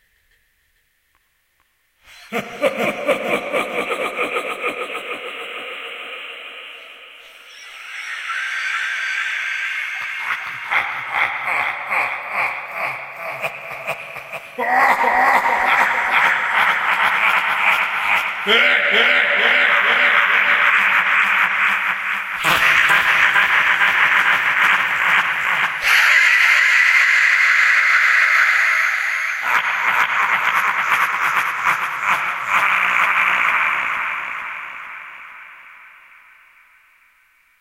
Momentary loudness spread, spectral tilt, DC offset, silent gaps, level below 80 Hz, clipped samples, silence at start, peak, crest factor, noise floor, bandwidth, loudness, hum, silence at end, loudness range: 16 LU; -1 dB/octave; under 0.1%; none; -60 dBFS; under 0.1%; 2.15 s; 0 dBFS; 18 dB; -64 dBFS; 16 kHz; -15 LUFS; none; 1.7 s; 13 LU